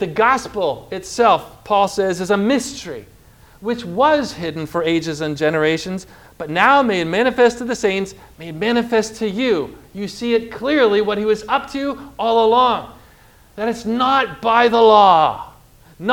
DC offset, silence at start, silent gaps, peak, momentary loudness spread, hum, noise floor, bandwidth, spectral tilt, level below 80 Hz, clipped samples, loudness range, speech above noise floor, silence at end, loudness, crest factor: under 0.1%; 0 s; none; 0 dBFS; 15 LU; none; -48 dBFS; 16.5 kHz; -4.5 dB/octave; -50 dBFS; under 0.1%; 4 LU; 31 dB; 0 s; -17 LUFS; 18 dB